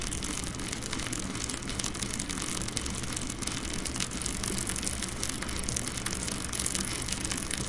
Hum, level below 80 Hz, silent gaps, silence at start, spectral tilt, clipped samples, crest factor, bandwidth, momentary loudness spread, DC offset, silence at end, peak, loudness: none; -42 dBFS; none; 0 s; -2.5 dB/octave; under 0.1%; 28 dB; 11.5 kHz; 3 LU; under 0.1%; 0 s; -4 dBFS; -32 LUFS